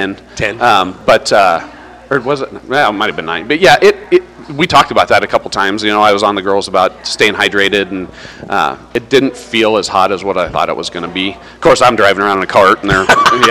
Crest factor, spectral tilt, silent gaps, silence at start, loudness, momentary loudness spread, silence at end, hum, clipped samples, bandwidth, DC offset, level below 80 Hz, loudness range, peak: 12 dB; -4 dB/octave; none; 0 s; -11 LUFS; 10 LU; 0 s; none; 0.5%; 16 kHz; under 0.1%; -40 dBFS; 3 LU; 0 dBFS